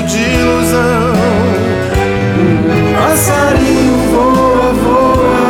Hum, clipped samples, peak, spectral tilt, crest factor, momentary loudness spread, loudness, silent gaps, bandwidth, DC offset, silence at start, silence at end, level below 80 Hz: none; under 0.1%; -2 dBFS; -5.5 dB/octave; 8 dB; 3 LU; -10 LUFS; none; 18 kHz; under 0.1%; 0 s; 0 s; -26 dBFS